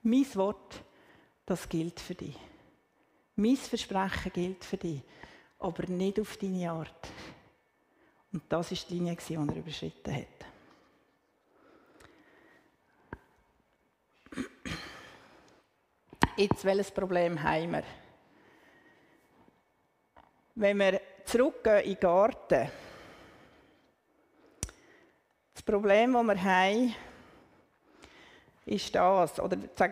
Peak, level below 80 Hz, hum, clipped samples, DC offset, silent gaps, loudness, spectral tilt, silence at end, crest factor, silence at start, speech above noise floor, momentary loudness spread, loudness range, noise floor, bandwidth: -8 dBFS; -58 dBFS; none; under 0.1%; under 0.1%; none; -31 LUFS; -5.5 dB/octave; 0 s; 26 dB; 0.05 s; 43 dB; 24 LU; 16 LU; -73 dBFS; 15.5 kHz